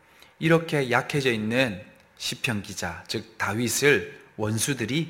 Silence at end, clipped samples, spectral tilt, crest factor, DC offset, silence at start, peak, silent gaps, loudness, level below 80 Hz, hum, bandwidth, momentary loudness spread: 0 s; under 0.1%; -4 dB/octave; 22 dB; under 0.1%; 0.4 s; -6 dBFS; none; -25 LUFS; -60 dBFS; none; 16.5 kHz; 11 LU